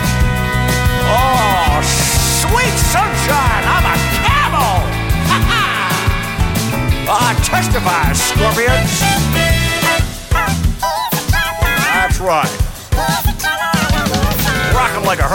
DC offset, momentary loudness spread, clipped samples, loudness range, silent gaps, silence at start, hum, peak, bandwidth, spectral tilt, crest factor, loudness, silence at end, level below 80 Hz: under 0.1%; 4 LU; under 0.1%; 2 LU; none; 0 s; none; -2 dBFS; 17 kHz; -4 dB/octave; 12 dB; -14 LUFS; 0 s; -20 dBFS